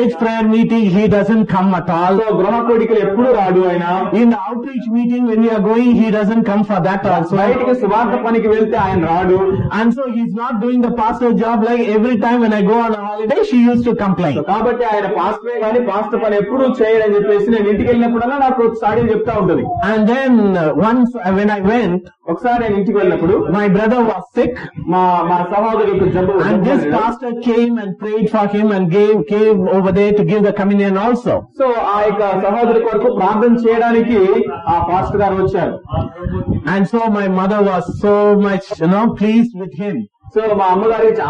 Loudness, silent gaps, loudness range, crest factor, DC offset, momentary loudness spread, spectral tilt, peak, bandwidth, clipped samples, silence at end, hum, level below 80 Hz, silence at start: -14 LUFS; none; 2 LU; 10 dB; under 0.1%; 6 LU; -8.5 dB/octave; -2 dBFS; 7.4 kHz; under 0.1%; 0 s; none; -40 dBFS; 0 s